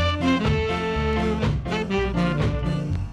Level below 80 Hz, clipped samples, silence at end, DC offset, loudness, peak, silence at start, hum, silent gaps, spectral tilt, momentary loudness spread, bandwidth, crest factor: -32 dBFS; under 0.1%; 0 s; under 0.1%; -24 LUFS; -8 dBFS; 0 s; none; none; -7 dB/octave; 4 LU; 11 kHz; 14 dB